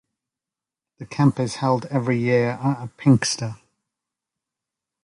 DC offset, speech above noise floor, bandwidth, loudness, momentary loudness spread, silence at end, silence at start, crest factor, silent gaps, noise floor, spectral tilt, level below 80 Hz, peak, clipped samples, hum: under 0.1%; 68 dB; 11.5 kHz; -21 LUFS; 8 LU; 1.5 s; 1 s; 20 dB; none; -89 dBFS; -6 dB/octave; -60 dBFS; -4 dBFS; under 0.1%; none